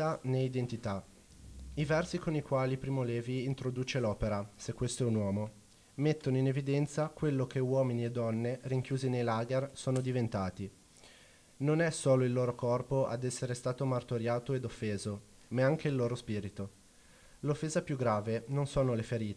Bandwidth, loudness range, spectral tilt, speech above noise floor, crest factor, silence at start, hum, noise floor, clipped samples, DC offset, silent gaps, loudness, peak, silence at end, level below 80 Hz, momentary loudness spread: 11 kHz; 3 LU; -6.5 dB/octave; 27 dB; 16 dB; 0 s; none; -60 dBFS; under 0.1%; under 0.1%; none; -34 LUFS; -18 dBFS; 0 s; -58 dBFS; 8 LU